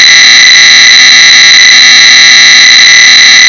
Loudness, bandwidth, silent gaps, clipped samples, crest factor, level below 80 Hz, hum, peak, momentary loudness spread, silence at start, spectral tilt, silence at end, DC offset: 3 LUFS; 8 kHz; none; 50%; 0 dB; -46 dBFS; none; 0 dBFS; 0 LU; 0 s; 3 dB/octave; 0 s; 0.4%